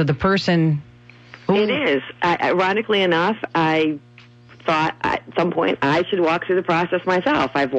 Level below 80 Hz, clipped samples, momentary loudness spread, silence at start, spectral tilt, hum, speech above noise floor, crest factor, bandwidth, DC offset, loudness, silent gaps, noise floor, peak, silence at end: -50 dBFS; under 0.1%; 4 LU; 0 s; -6.5 dB/octave; none; 27 dB; 14 dB; 8.2 kHz; under 0.1%; -19 LUFS; none; -46 dBFS; -4 dBFS; 0 s